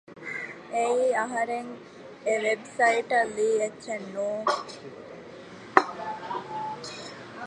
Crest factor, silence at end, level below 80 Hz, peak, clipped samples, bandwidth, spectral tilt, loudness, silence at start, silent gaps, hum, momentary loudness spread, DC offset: 28 dB; 0 s; -72 dBFS; 0 dBFS; under 0.1%; 11.5 kHz; -3.5 dB/octave; -28 LUFS; 0.1 s; none; none; 19 LU; under 0.1%